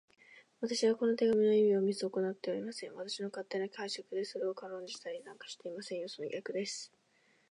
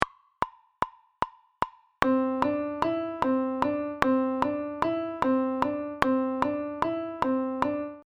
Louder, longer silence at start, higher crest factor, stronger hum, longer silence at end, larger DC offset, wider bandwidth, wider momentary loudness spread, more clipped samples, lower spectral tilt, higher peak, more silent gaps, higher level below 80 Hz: second, -35 LUFS vs -29 LUFS; first, 0.3 s vs 0 s; second, 16 dB vs 28 dB; neither; first, 0.65 s vs 0.05 s; neither; first, 11 kHz vs 9.8 kHz; first, 16 LU vs 9 LU; neither; second, -4.5 dB/octave vs -6.5 dB/octave; second, -18 dBFS vs 0 dBFS; neither; second, -86 dBFS vs -56 dBFS